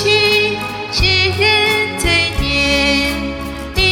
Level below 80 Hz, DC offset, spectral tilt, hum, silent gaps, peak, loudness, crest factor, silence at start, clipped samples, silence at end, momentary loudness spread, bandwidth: -28 dBFS; under 0.1%; -3.5 dB/octave; none; none; -2 dBFS; -13 LUFS; 14 dB; 0 s; under 0.1%; 0 s; 11 LU; 18 kHz